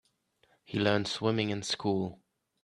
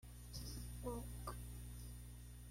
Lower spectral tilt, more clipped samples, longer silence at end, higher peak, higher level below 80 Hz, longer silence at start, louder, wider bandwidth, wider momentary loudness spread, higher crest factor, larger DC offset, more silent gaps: about the same, -5 dB/octave vs -5 dB/octave; neither; first, 0.5 s vs 0 s; first, -12 dBFS vs -34 dBFS; second, -68 dBFS vs -54 dBFS; first, 0.7 s vs 0 s; first, -31 LUFS vs -51 LUFS; second, 11.5 kHz vs 16.5 kHz; about the same, 7 LU vs 7 LU; first, 22 dB vs 16 dB; neither; neither